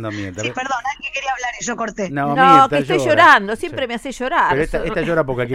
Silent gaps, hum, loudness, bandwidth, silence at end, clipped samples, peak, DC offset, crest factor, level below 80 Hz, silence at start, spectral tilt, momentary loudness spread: none; none; -16 LUFS; 15.5 kHz; 0 s; under 0.1%; 0 dBFS; under 0.1%; 16 dB; -40 dBFS; 0 s; -4.5 dB/octave; 14 LU